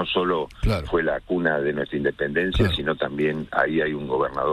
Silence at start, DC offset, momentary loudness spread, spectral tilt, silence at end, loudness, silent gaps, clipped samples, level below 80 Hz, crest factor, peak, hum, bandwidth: 0 s; under 0.1%; 4 LU; -7 dB/octave; 0 s; -24 LUFS; none; under 0.1%; -36 dBFS; 18 dB; -4 dBFS; none; 13.5 kHz